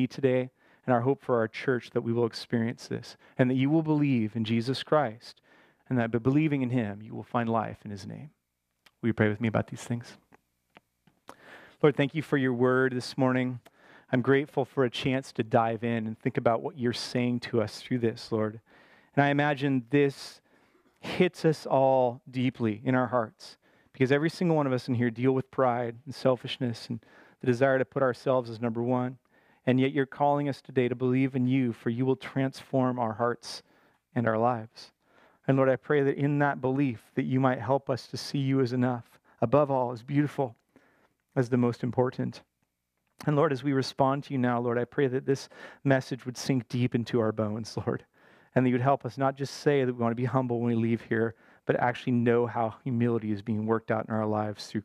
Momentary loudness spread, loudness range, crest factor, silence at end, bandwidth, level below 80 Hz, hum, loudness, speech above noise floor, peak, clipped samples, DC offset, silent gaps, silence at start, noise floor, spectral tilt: 9 LU; 3 LU; 20 dB; 0 s; 12.5 kHz; -70 dBFS; none; -28 LUFS; 52 dB; -8 dBFS; under 0.1%; under 0.1%; none; 0 s; -80 dBFS; -7 dB/octave